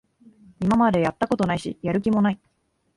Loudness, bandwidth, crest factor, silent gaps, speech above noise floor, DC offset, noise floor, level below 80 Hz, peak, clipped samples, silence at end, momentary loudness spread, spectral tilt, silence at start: -22 LUFS; 11.5 kHz; 16 dB; none; 31 dB; under 0.1%; -52 dBFS; -52 dBFS; -6 dBFS; under 0.1%; 0.6 s; 8 LU; -7.5 dB/octave; 0.6 s